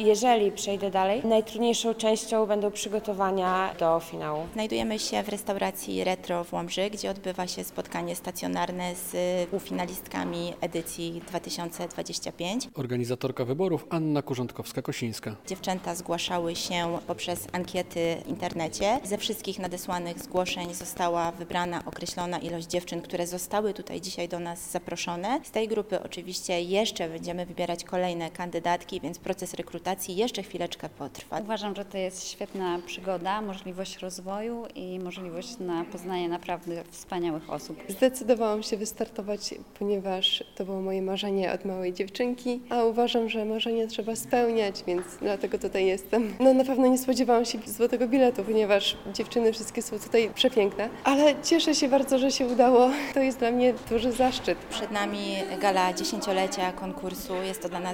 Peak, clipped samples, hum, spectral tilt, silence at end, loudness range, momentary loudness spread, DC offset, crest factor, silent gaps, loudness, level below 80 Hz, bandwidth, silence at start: -8 dBFS; under 0.1%; none; -4 dB/octave; 0 s; 9 LU; 11 LU; 0.1%; 20 dB; none; -28 LUFS; -58 dBFS; 17 kHz; 0 s